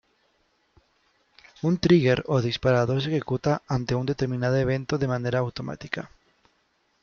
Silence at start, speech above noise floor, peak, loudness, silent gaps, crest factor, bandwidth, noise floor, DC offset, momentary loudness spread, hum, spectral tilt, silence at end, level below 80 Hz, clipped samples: 1.65 s; 45 dB; -8 dBFS; -25 LUFS; none; 18 dB; 7 kHz; -69 dBFS; under 0.1%; 13 LU; none; -7 dB/octave; 0.95 s; -52 dBFS; under 0.1%